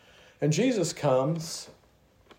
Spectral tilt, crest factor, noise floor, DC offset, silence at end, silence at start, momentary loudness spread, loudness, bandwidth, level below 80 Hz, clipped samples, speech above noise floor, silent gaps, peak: -5.5 dB/octave; 16 dB; -62 dBFS; under 0.1%; 0.7 s; 0.4 s; 13 LU; -27 LUFS; 16 kHz; -68 dBFS; under 0.1%; 35 dB; none; -12 dBFS